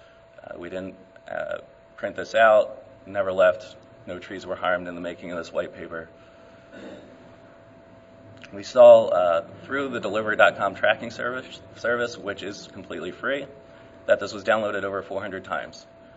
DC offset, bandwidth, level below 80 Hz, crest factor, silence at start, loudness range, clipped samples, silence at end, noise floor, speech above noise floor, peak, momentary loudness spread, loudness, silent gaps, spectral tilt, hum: under 0.1%; 8 kHz; -64 dBFS; 24 dB; 0.5 s; 13 LU; under 0.1%; 0.35 s; -49 dBFS; 26 dB; -2 dBFS; 22 LU; -23 LUFS; none; -4.5 dB/octave; none